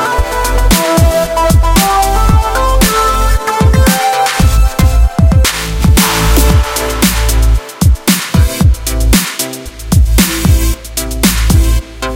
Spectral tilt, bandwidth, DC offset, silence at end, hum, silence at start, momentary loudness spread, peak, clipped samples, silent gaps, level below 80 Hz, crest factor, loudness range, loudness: -4.5 dB/octave; 17.5 kHz; under 0.1%; 0 s; none; 0 s; 5 LU; 0 dBFS; under 0.1%; none; -12 dBFS; 10 dB; 2 LU; -11 LUFS